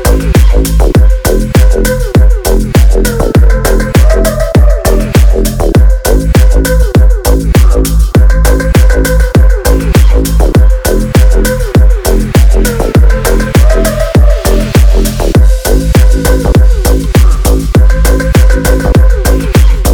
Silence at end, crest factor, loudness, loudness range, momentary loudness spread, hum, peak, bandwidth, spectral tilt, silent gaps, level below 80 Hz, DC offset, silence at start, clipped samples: 0 s; 6 dB; -8 LUFS; 0 LU; 3 LU; none; 0 dBFS; 18.5 kHz; -6 dB/octave; none; -6 dBFS; under 0.1%; 0 s; 10%